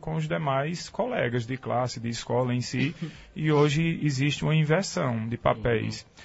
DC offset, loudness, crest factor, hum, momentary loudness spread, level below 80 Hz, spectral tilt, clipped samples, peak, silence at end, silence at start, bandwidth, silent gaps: under 0.1%; -27 LUFS; 18 dB; none; 8 LU; -52 dBFS; -6 dB/octave; under 0.1%; -10 dBFS; 0 s; 0 s; 8 kHz; none